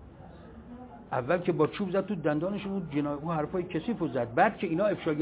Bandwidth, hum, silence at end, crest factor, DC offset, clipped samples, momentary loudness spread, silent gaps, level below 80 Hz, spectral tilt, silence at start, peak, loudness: 4 kHz; none; 0 s; 20 dB; under 0.1%; under 0.1%; 21 LU; none; -58 dBFS; -6 dB/octave; 0 s; -10 dBFS; -30 LUFS